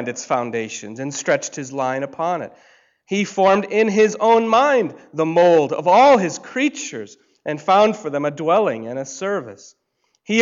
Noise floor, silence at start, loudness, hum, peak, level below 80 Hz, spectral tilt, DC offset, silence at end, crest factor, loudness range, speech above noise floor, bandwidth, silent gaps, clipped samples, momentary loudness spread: -42 dBFS; 0 s; -18 LUFS; none; -4 dBFS; -66 dBFS; -4.5 dB/octave; under 0.1%; 0 s; 14 dB; 6 LU; 24 dB; 7.8 kHz; none; under 0.1%; 15 LU